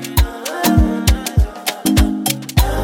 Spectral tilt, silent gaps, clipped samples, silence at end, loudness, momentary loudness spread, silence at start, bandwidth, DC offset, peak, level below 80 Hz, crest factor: -5 dB/octave; none; under 0.1%; 0 s; -17 LUFS; 5 LU; 0 s; 17 kHz; under 0.1%; 0 dBFS; -20 dBFS; 14 dB